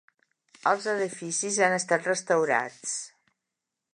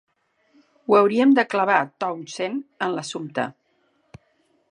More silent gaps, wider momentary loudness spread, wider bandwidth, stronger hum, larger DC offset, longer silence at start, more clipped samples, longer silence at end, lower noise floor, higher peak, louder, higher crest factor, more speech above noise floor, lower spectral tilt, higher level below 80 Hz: neither; second, 9 LU vs 12 LU; about the same, 11 kHz vs 10.5 kHz; neither; neither; second, 0.65 s vs 0.9 s; neither; second, 0.85 s vs 1.2 s; first, -86 dBFS vs -66 dBFS; second, -8 dBFS vs -4 dBFS; second, -27 LUFS vs -22 LUFS; about the same, 22 dB vs 20 dB; first, 59 dB vs 45 dB; second, -2.5 dB/octave vs -5 dB/octave; second, -82 dBFS vs -70 dBFS